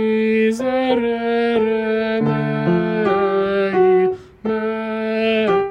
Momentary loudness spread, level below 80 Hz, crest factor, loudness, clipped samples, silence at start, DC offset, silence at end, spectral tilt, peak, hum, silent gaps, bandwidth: 6 LU; -52 dBFS; 12 dB; -18 LUFS; under 0.1%; 0 s; under 0.1%; 0 s; -7.5 dB/octave; -4 dBFS; none; none; 10 kHz